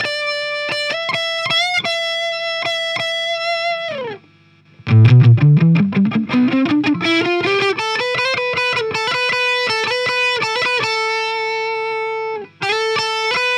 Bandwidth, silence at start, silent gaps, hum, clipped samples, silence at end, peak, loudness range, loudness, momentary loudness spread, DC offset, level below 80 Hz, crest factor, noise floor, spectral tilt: 10.5 kHz; 0 s; none; none; under 0.1%; 0 s; 0 dBFS; 5 LU; -16 LUFS; 9 LU; under 0.1%; -60 dBFS; 16 dB; -50 dBFS; -5.5 dB/octave